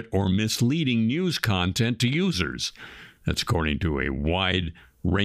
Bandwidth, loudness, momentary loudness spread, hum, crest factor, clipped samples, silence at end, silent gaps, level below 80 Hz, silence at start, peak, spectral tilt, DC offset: 15.5 kHz; -25 LUFS; 8 LU; none; 20 dB; under 0.1%; 0 s; none; -40 dBFS; 0 s; -6 dBFS; -5 dB/octave; under 0.1%